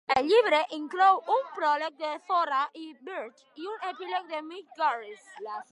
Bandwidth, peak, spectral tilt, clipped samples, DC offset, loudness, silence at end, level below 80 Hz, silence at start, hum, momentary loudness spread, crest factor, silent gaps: 11.5 kHz; -10 dBFS; -3 dB/octave; under 0.1%; under 0.1%; -27 LUFS; 0.1 s; -72 dBFS; 0.1 s; none; 19 LU; 18 dB; none